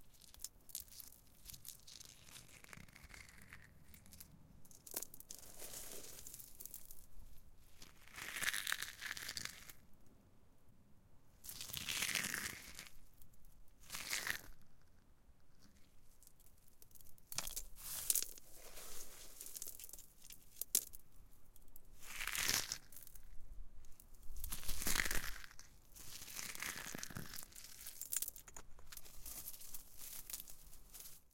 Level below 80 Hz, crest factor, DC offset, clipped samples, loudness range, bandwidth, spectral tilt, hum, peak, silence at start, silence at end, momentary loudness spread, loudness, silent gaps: -58 dBFS; 36 dB; under 0.1%; under 0.1%; 11 LU; 17 kHz; -0.5 dB/octave; none; -12 dBFS; 0 s; 0.05 s; 24 LU; -44 LUFS; none